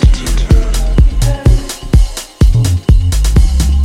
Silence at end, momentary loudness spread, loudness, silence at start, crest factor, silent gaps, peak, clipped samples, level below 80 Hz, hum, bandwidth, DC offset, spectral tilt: 0 s; 3 LU; -12 LUFS; 0 s; 8 dB; none; 0 dBFS; 0.3%; -10 dBFS; none; 15 kHz; under 0.1%; -6 dB/octave